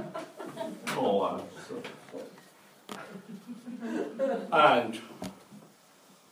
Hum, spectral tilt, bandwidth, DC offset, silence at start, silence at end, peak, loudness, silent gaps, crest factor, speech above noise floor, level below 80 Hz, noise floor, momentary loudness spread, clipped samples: none; -4.5 dB/octave; 16 kHz; under 0.1%; 0 s; 0.65 s; -10 dBFS; -30 LUFS; none; 24 dB; 31 dB; -78 dBFS; -59 dBFS; 22 LU; under 0.1%